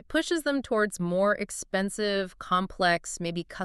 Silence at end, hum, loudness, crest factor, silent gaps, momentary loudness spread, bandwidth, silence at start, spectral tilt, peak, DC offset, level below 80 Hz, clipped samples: 0 s; none; -28 LUFS; 18 dB; none; 5 LU; 13.5 kHz; 0.1 s; -4 dB/octave; -10 dBFS; under 0.1%; -54 dBFS; under 0.1%